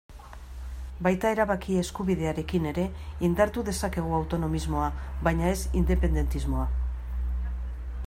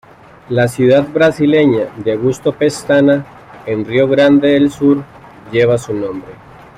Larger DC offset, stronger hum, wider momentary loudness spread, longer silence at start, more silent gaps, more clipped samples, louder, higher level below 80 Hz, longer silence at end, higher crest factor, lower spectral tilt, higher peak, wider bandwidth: neither; neither; about the same, 11 LU vs 11 LU; second, 0.1 s vs 0.5 s; neither; neither; second, -28 LUFS vs -13 LUFS; first, -32 dBFS vs -48 dBFS; second, 0 s vs 0.45 s; first, 18 dB vs 12 dB; about the same, -6.5 dB/octave vs -6.5 dB/octave; second, -8 dBFS vs 0 dBFS; first, 16 kHz vs 13 kHz